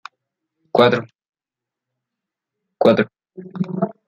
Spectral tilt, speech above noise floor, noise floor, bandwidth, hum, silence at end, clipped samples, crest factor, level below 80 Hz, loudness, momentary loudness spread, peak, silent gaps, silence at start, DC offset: -7.5 dB/octave; 71 dB; -87 dBFS; 7.6 kHz; none; 0.2 s; under 0.1%; 20 dB; -62 dBFS; -18 LUFS; 12 LU; -2 dBFS; 1.29-1.33 s; 0.75 s; under 0.1%